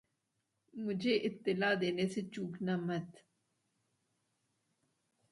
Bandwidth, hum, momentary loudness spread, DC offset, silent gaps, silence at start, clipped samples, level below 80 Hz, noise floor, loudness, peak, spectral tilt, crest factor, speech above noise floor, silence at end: 11.5 kHz; none; 10 LU; under 0.1%; none; 0.75 s; under 0.1%; -80 dBFS; -84 dBFS; -36 LUFS; -20 dBFS; -6 dB/octave; 20 dB; 48 dB; 2.2 s